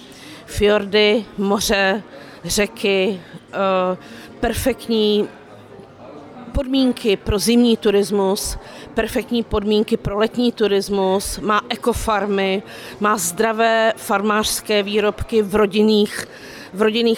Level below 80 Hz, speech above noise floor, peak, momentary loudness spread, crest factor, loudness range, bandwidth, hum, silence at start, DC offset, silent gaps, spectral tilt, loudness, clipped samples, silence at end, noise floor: -38 dBFS; 22 dB; -6 dBFS; 14 LU; 14 dB; 3 LU; 18.5 kHz; none; 0 s; under 0.1%; none; -4 dB/octave; -18 LUFS; under 0.1%; 0 s; -40 dBFS